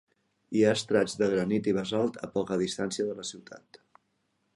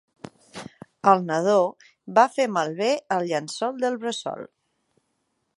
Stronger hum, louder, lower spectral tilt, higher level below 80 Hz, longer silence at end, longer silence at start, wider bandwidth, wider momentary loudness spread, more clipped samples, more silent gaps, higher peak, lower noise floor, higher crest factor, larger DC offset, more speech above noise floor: neither; second, -29 LUFS vs -23 LUFS; about the same, -5 dB/octave vs -4.5 dB/octave; first, -66 dBFS vs -74 dBFS; about the same, 1 s vs 1.1 s; about the same, 0.5 s vs 0.55 s; about the same, 11.5 kHz vs 11.5 kHz; second, 12 LU vs 21 LU; neither; neither; second, -10 dBFS vs -2 dBFS; about the same, -75 dBFS vs -74 dBFS; about the same, 20 dB vs 22 dB; neither; second, 47 dB vs 52 dB